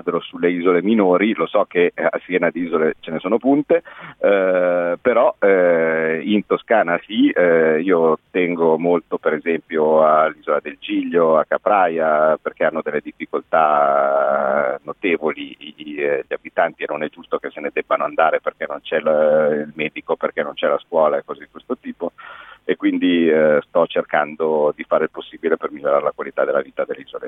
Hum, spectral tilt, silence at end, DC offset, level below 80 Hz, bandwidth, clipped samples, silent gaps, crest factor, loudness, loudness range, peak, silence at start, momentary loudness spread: none; -9 dB/octave; 0 s; under 0.1%; -64 dBFS; 3.9 kHz; under 0.1%; none; 16 dB; -18 LUFS; 5 LU; -2 dBFS; 0.05 s; 11 LU